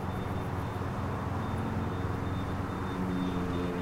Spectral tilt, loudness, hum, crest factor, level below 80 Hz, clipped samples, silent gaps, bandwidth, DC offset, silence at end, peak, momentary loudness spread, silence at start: -7.5 dB/octave; -34 LUFS; none; 12 dB; -46 dBFS; under 0.1%; none; 16 kHz; under 0.1%; 0 s; -20 dBFS; 2 LU; 0 s